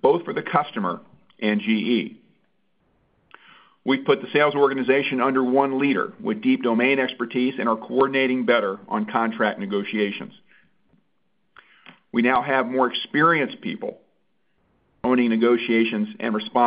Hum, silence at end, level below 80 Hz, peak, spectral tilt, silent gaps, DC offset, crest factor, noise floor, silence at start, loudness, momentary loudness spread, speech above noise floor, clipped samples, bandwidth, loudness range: none; 0 s; -68 dBFS; -4 dBFS; -10 dB/octave; none; under 0.1%; 20 dB; -73 dBFS; 0.05 s; -22 LUFS; 9 LU; 51 dB; under 0.1%; 5.2 kHz; 6 LU